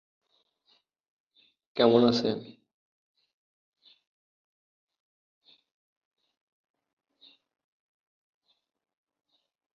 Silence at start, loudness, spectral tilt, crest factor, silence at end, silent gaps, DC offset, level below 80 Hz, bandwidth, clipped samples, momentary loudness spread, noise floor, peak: 1.75 s; -25 LUFS; -4.5 dB/octave; 28 dB; 7.3 s; none; under 0.1%; -72 dBFS; 7 kHz; under 0.1%; 17 LU; -71 dBFS; -8 dBFS